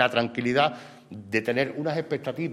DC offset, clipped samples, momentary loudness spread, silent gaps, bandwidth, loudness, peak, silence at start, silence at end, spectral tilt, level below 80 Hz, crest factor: under 0.1%; under 0.1%; 18 LU; none; 13.5 kHz; -26 LUFS; -6 dBFS; 0 s; 0 s; -6 dB/octave; -68 dBFS; 22 dB